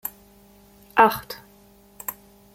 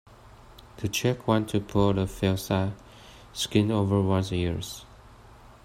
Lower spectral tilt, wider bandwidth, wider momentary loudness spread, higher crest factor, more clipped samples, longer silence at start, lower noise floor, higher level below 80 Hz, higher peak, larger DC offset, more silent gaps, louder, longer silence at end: second, -3.5 dB/octave vs -6 dB/octave; about the same, 16.5 kHz vs 16 kHz; first, 20 LU vs 11 LU; first, 26 dB vs 20 dB; neither; second, 0.05 s vs 0.25 s; about the same, -53 dBFS vs -50 dBFS; second, -60 dBFS vs -50 dBFS; first, -2 dBFS vs -8 dBFS; neither; neither; first, -23 LUFS vs -27 LUFS; about the same, 0.45 s vs 0.5 s